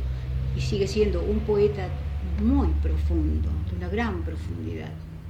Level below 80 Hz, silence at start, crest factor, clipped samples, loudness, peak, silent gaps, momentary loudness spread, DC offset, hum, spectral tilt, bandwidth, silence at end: -28 dBFS; 0 s; 14 dB; under 0.1%; -26 LUFS; -12 dBFS; none; 10 LU; under 0.1%; none; -7.5 dB/octave; 8.4 kHz; 0 s